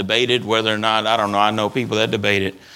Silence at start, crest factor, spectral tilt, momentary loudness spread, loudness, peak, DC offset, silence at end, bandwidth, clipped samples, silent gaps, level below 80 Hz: 0 s; 18 dB; -4.5 dB/octave; 3 LU; -18 LUFS; 0 dBFS; under 0.1%; 0 s; 17.5 kHz; under 0.1%; none; -60 dBFS